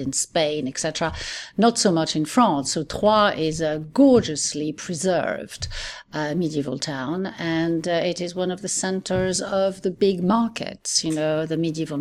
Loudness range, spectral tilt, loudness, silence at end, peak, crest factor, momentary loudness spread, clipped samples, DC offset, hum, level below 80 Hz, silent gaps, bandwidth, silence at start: 6 LU; -4 dB/octave; -22 LUFS; 0 s; -6 dBFS; 16 dB; 10 LU; under 0.1%; under 0.1%; none; -48 dBFS; none; 14.5 kHz; 0 s